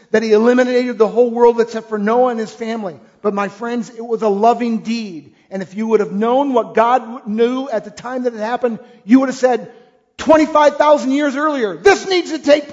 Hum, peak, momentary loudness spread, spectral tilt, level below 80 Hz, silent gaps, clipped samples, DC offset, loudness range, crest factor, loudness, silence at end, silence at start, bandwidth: none; 0 dBFS; 11 LU; -5 dB/octave; -56 dBFS; none; under 0.1%; under 0.1%; 4 LU; 16 dB; -16 LUFS; 0 s; 0.15 s; 7.8 kHz